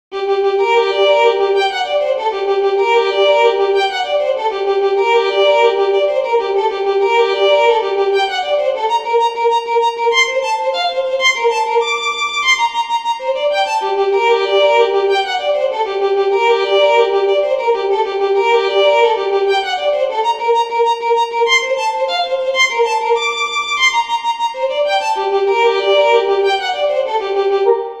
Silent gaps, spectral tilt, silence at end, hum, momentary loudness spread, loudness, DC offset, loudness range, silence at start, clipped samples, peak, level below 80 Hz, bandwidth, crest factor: none; -0.5 dB/octave; 0 s; none; 5 LU; -14 LUFS; under 0.1%; 2 LU; 0.1 s; under 0.1%; 0 dBFS; -58 dBFS; 10 kHz; 14 dB